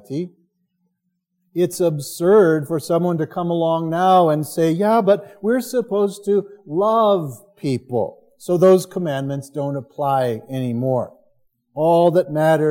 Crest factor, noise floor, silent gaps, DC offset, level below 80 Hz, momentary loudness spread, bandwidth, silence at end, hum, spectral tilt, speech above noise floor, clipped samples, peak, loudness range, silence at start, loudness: 16 dB; -73 dBFS; none; under 0.1%; -68 dBFS; 12 LU; 17 kHz; 0 s; none; -6.5 dB/octave; 55 dB; under 0.1%; -2 dBFS; 3 LU; 0.1 s; -19 LUFS